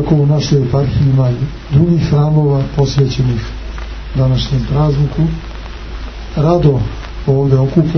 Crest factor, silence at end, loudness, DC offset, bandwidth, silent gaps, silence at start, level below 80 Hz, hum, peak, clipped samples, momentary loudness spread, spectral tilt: 12 dB; 0 s; -13 LUFS; under 0.1%; 6.4 kHz; none; 0 s; -26 dBFS; none; 0 dBFS; under 0.1%; 15 LU; -8 dB/octave